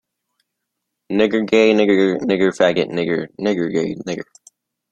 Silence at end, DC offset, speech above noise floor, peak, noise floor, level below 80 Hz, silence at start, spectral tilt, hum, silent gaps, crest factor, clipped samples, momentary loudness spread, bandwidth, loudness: 0.7 s; under 0.1%; 61 dB; -2 dBFS; -78 dBFS; -58 dBFS; 1.1 s; -6 dB/octave; none; none; 18 dB; under 0.1%; 12 LU; 9.4 kHz; -17 LUFS